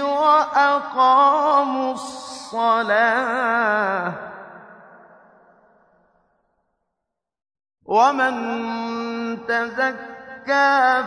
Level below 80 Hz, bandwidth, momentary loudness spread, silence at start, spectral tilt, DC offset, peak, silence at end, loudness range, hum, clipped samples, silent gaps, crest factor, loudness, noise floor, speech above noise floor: -68 dBFS; 11 kHz; 16 LU; 0 s; -4 dB/octave; under 0.1%; -4 dBFS; 0 s; 8 LU; none; under 0.1%; none; 16 dB; -19 LUFS; -82 dBFS; 63 dB